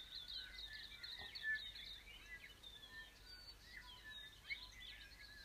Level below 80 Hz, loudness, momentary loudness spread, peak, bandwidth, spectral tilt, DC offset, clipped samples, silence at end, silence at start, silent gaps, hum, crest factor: -68 dBFS; -51 LUFS; 12 LU; -36 dBFS; 15.5 kHz; -1 dB/octave; under 0.1%; under 0.1%; 0 s; 0 s; none; none; 18 dB